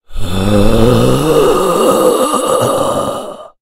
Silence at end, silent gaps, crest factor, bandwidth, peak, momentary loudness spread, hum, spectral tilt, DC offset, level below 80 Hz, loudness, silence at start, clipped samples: 0.15 s; none; 10 dB; 16.5 kHz; 0 dBFS; 9 LU; none; -5.5 dB/octave; under 0.1%; -22 dBFS; -12 LUFS; 0.1 s; 0.2%